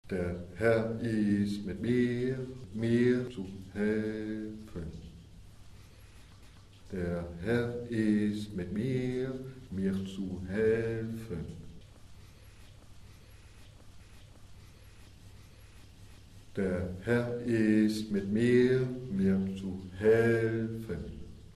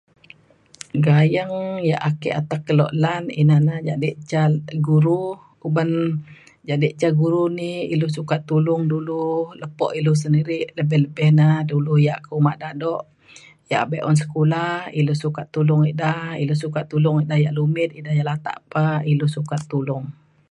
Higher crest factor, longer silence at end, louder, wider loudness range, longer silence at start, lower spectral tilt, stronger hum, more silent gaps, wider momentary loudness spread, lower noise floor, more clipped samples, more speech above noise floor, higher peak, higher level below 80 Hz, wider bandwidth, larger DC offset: about the same, 18 dB vs 16 dB; second, 0 s vs 0.4 s; second, -32 LUFS vs -20 LUFS; first, 13 LU vs 2 LU; second, 0.05 s vs 0.95 s; about the same, -7.5 dB/octave vs -8 dB/octave; neither; neither; first, 15 LU vs 9 LU; about the same, -54 dBFS vs -52 dBFS; neither; second, 23 dB vs 33 dB; second, -14 dBFS vs -4 dBFS; first, -54 dBFS vs -62 dBFS; first, 13 kHz vs 10.5 kHz; neither